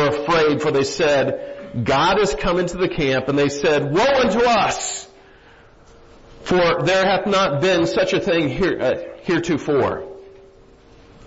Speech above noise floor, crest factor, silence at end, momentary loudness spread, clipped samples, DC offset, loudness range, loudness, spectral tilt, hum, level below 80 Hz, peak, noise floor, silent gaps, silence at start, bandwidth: 29 dB; 14 dB; 0.05 s; 8 LU; under 0.1%; under 0.1%; 2 LU; -18 LUFS; -4.5 dB/octave; none; -42 dBFS; -6 dBFS; -48 dBFS; none; 0 s; 8 kHz